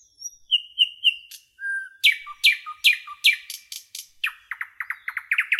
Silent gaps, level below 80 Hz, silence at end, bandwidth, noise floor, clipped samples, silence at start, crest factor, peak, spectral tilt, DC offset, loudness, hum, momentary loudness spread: none; -74 dBFS; 0 s; 16.5 kHz; -43 dBFS; under 0.1%; 0.2 s; 20 dB; -6 dBFS; 7 dB/octave; under 0.1%; -21 LUFS; none; 17 LU